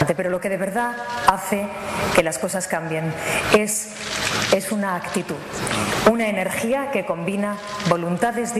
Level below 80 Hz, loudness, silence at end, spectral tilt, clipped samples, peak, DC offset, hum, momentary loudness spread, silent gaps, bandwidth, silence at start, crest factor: -48 dBFS; -22 LUFS; 0 s; -4 dB/octave; under 0.1%; 0 dBFS; under 0.1%; none; 7 LU; none; 14 kHz; 0 s; 22 dB